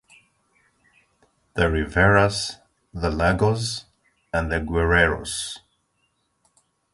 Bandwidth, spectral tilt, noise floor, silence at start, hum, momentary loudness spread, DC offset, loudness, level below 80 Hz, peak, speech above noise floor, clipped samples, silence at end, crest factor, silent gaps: 11.5 kHz; -5 dB/octave; -70 dBFS; 1.55 s; none; 16 LU; under 0.1%; -22 LUFS; -36 dBFS; -4 dBFS; 49 dB; under 0.1%; 1.35 s; 22 dB; none